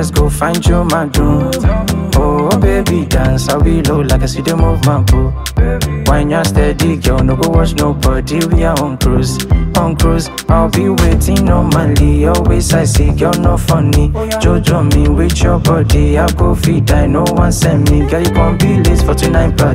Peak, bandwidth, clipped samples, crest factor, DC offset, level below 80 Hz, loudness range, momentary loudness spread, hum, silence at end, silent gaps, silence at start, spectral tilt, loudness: 0 dBFS; 16.5 kHz; under 0.1%; 10 dB; under 0.1%; -16 dBFS; 2 LU; 3 LU; none; 0 s; none; 0 s; -6 dB/octave; -12 LUFS